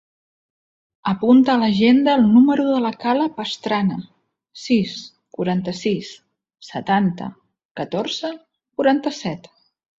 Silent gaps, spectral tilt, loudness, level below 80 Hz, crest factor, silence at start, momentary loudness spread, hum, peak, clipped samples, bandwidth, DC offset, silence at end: 7.65-7.75 s; -6.5 dB/octave; -19 LUFS; -60 dBFS; 16 dB; 1.05 s; 19 LU; none; -4 dBFS; under 0.1%; 7.6 kHz; under 0.1%; 0.6 s